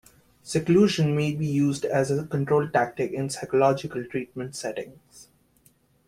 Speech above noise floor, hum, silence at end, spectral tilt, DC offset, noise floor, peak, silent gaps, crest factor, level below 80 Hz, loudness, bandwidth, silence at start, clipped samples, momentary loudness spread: 38 dB; none; 0.85 s; -6 dB/octave; under 0.1%; -62 dBFS; -8 dBFS; none; 18 dB; -60 dBFS; -25 LUFS; 15 kHz; 0.45 s; under 0.1%; 12 LU